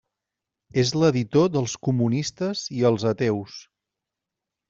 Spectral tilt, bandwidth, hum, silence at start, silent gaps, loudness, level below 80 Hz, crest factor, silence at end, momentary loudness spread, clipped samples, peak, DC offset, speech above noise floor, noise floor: -6 dB/octave; 7.8 kHz; none; 0.75 s; none; -23 LUFS; -60 dBFS; 18 dB; 1.1 s; 9 LU; under 0.1%; -6 dBFS; under 0.1%; 64 dB; -86 dBFS